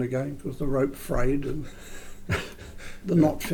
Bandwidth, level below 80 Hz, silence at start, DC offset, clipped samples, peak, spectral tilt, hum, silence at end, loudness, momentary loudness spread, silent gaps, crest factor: 19 kHz; -36 dBFS; 0 s; under 0.1%; under 0.1%; -10 dBFS; -6.5 dB/octave; none; 0 s; -28 LUFS; 20 LU; none; 16 dB